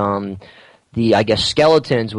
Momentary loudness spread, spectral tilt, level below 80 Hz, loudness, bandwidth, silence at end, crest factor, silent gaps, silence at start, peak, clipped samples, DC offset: 16 LU; -5.5 dB/octave; -46 dBFS; -15 LUFS; 11 kHz; 0 s; 14 dB; none; 0 s; -4 dBFS; under 0.1%; under 0.1%